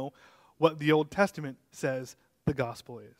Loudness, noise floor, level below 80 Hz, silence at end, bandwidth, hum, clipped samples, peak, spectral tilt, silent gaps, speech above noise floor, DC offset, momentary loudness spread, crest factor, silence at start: -30 LUFS; -60 dBFS; -60 dBFS; 0.15 s; 16 kHz; none; under 0.1%; -8 dBFS; -6 dB/octave; none; 30 dB; under 0.1%; 16 LU; 24 dB; 0 s